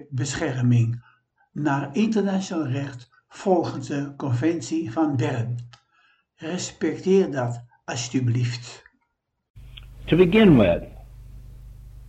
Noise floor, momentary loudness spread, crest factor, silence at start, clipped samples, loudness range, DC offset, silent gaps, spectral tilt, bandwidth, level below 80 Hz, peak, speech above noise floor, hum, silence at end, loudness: -75 dBFS; 17 LU; 20 dB; 0 s; under 0.1%; 5 LU; under 0.1%; 9.50-9.54 s; -6.5 dB/octave; 8.8 kHz; -46 dBFS; -4 dBFS; 53 dB; none; 0 s; -23 LUFS